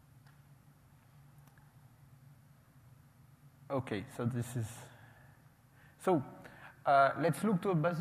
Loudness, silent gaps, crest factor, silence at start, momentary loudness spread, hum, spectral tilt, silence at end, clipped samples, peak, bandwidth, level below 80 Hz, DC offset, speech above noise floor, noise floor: -34 LUFS; none; 22 dB; 3.7 s; 23 LU; none; -7 dB/octave; 0 s; under 0.1%; -16 dBFS; 15 kHz; -72 dBFS; under 0.1%; 30 dB; -63 dBFS